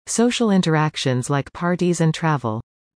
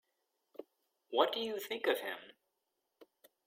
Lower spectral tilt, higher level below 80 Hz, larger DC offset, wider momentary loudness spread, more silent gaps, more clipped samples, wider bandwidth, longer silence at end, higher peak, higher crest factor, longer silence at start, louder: first, -5.5 dB/octave vs -2.5 dB/octave; first, -56 dBFS vs -88 dBFS; neither; second, 6 LU vs 22 LU; neither; neither; second, 10.5 kHz vs 16.5 kHz; about the same, 0.35 s vs 0.45 s; first, -6 dBFS vs -12 dBFS; second, 14 dB vs 28 dB; second, 0.05 s vs 0.6 s; first, -20 LUFS vs -36 LUFS